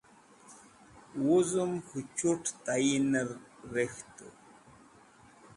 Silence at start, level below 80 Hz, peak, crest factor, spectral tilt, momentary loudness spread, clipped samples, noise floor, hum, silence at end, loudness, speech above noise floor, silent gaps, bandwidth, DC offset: 0.5 s; -70 dBFS; -16 dBFS; 18 dB; -4.5 dB/octave; 20 LU; under 0.1%; -59 dBFS; none; 1.25 s; -31 LUFS; 28 dB; none; 11.5 kHz; under 0.1%